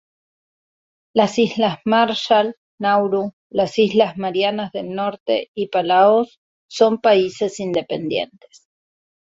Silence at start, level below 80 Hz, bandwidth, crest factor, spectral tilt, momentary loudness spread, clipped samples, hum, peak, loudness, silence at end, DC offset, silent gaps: 1.15 s; -62 dBFS; 8 kHz; 18 dB; -5 dB/octave; 10 LU; under 0.1%; none; -2 dBFS; -19 LUFS; 1.1 s; under 0.1%; 2.57-2.78 s, 3.33-3.50 s, 5.20-5.26 s, 5.48-5.54 s, 6.38-6.69 s